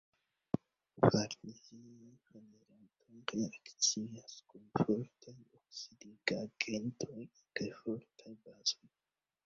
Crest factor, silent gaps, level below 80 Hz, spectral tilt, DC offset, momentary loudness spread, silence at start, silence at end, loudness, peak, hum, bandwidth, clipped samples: 28 dB; none; -72 dBFS; -4 dB/octave; under 0.1%; 24 LU; 0.95 s; 0.7 s; -38 LUFS; -12 dBFS; none; 7.4 kHz; under 0.1%